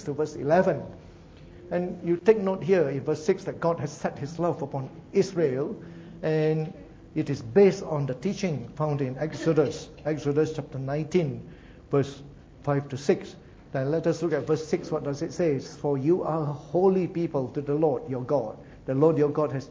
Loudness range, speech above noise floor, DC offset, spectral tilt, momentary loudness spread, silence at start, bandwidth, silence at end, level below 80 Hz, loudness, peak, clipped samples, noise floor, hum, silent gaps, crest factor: 3 LU; 22 dB; under 0.1%; -7.5 dB/octave; 11 LU; 0 s; 7.8 kHz; 0 s; -56 dBFS; -27 LUFS; -6 dBFS; under 0.1%; -48 dBFS; none; none; 20 dB